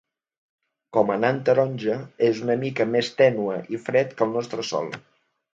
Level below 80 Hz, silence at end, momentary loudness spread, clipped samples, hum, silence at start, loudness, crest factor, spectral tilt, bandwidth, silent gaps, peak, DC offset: -70 dBFS; 0.55 s; 8 LU; under 0.1%; none; 0.95 s; -23 LUFS; 20 dB; -6 dB/octave; 7.8 kHz; none; -4 dBFS; under 0.1%